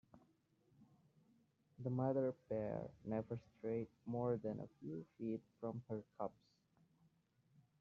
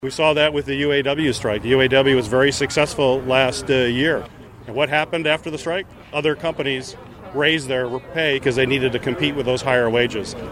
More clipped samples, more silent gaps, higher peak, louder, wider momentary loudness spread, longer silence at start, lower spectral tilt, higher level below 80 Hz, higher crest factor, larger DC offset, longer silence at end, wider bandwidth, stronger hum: neither; neither; second, -26 dBFS vs -2 dBFS; second, -45 LUFS vs -19 LUFS; about the same, 10 LU vs 9 LU; first, 0.15 s vs 0 s; first, -10 dB/octave vs -4.5 dB/octave; second, -78 dBFS vs -46 dBFS; about the same, 20 dB vs 18 dB; neither; first, 1.5 s vs 0 s; second, 6.8 kHz vs 15 kHz; neither